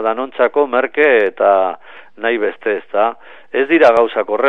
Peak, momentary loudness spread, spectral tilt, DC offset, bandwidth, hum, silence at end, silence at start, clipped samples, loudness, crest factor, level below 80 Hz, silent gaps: 0 dBFS; 10 LU; -5.5 dB/octave; 0.9%; 6.6 kHz; none; 0 s; 0 s; under 0.1%; -15 LUFS; 14 dB; -64 dBFS; none